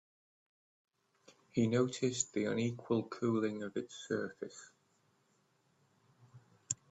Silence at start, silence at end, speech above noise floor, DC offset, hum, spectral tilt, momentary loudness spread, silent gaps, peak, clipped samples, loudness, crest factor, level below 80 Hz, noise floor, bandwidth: 1.55 s; 0.15 s; 39 dB; under 0.1%; none; -5 dB/octave; 11 LU; none; -18 dBFS; under 0.1%; -36 LUFS; 22 dB; -78 dBFS; -75 dBFS; 8.4 kHz